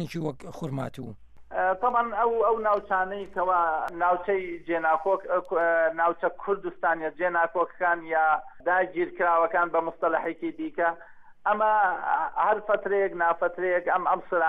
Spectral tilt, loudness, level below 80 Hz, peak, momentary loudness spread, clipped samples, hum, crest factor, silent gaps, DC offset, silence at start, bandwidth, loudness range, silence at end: -7 dB/octave; -26 LUFS; -60 dBFS; -10 dBFS; 9 LU; under 0.1%; none; 16 dB; none; under 0.1%; 0 s; 12 kHz; 1 LU; 0 s